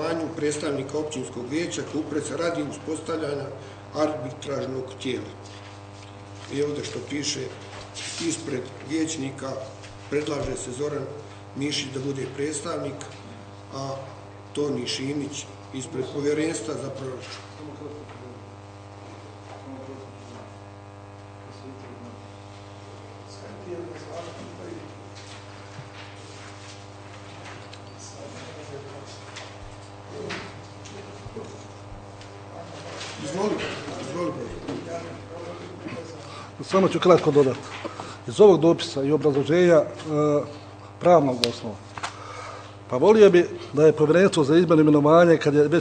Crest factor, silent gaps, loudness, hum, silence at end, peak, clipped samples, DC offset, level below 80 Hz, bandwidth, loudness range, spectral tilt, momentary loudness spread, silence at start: 26 dB; none; -24 LUFS; 50 Hz at -45 dBFS; 0 s; 0 dBFS; under 0.1%; under 0.1%; -58 dBFS; 12 kHz; 20 LU; -5.5 dB/octave; 24 LU; 0 s